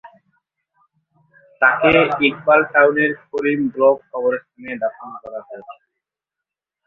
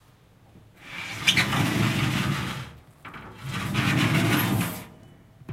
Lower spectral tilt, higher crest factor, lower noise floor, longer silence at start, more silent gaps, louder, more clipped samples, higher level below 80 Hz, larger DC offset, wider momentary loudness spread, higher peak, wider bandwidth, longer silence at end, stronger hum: first, -7.5 dB/octave vs -4.5 dB/octave; second, 18 dB vs 24 dB; first, -85 dBFS vs -55 dBFS; second, 0.05 s vs 0.55 s; neither; first, -17 LUFS vs -24 LUFS; neither; second, -56 dBFS vs -50 dBFS; neither; about the same, 19 LU vs 20 LU; about the same, -2 dBFS vs -4 dBFS; second, 5.6 kHz vs 16 kHz; first, 1.15 s vs 0 s; neither